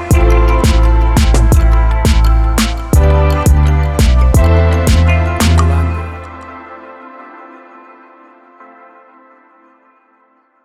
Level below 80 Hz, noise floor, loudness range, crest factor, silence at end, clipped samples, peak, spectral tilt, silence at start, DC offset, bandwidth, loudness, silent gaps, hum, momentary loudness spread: -12 dBFS; -53 dBFS; 9 LU; 12 dB; 3.2 s; under 0.1%; 0 dBFS; -6 dB/octave; 0 s; under 0.1%; 14.5 kHz; -11 LUFS; none; none; 20 LU